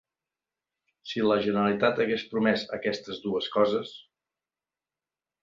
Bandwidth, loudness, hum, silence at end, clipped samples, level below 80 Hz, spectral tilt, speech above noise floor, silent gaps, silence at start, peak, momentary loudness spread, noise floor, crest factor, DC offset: 7.4 kHz; -27 LUFS; none; 1.4 s; under 0.1%; -68 dBFS; -6 dB/octave; over 63 dB; none; 1.05 s; -10 dBFS; 9 LU; under -90 dBFS; 20 dB; under 0.1%